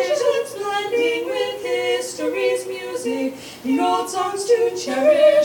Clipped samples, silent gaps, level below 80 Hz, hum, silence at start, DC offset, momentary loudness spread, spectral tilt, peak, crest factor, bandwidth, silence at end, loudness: under 0.1%; none; -66 dBFS; none; 0 s; under 0.1%; 7 LU; -2.5 dB/octave; -4 dBFS; 16 dB; 17.5 kHz; 0 s; -21 LUFS